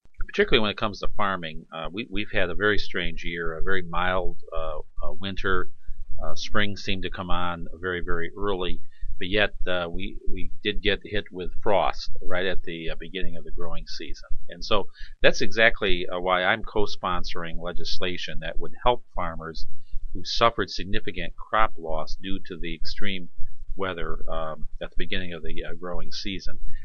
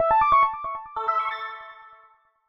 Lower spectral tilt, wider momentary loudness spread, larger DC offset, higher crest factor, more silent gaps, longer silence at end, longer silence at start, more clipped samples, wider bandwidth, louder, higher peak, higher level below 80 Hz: about the same, -4.5 dB/octave vs -5 dB/octave; second, 15 LU vs 19 LU; neither; about the same, 16 dB vs 16 dB; neither; second, 0 s vs 0.6 s; about the same, 0.05 s vs 0 s; neither; about the same, 6.8 kHz vs 6.2 kHz; second, -28 LUFS vs -23 LUFS; first, -2 dBFS vs -10 dBFS; first, -36 dBFS vs -54 dBFS